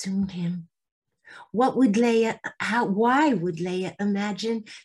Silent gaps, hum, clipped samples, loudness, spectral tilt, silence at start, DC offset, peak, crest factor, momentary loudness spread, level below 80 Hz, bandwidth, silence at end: 0.92-1.02 s; none; under 0.1%; -24 LUFS; -6 dB/octave; 0 s; under 0.1%; -10 dBFS; 14 dB; 10 LU; -64 dBFS; 12 kHz; 0.05 s